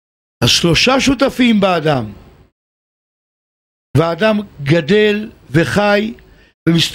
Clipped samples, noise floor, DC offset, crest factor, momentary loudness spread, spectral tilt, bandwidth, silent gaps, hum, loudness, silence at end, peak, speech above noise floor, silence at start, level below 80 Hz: under 0.1%; under -90 dBFS; under 0.1%; 14 dB; 9 LU; -5 dB/octave; 16 kHz; 2.52-3.94 s, 6.54-6.66 s; none; -14 LUFS; 0 s; -2 dBFS; over 77 dB; 0.4 s; -40 dBFS